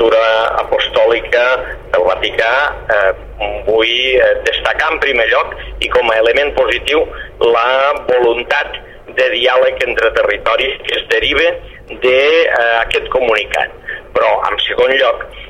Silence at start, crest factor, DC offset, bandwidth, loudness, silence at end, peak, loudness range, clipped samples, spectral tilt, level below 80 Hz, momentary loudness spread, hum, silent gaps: 0 s; 14 dB; 0.3%; 11 kHz; -13 LUFS; 0 s; 0 dBFS; 1 LU; under 0.1%; -3.5 dB/octave; -36 dBFS; 7 LU; none; none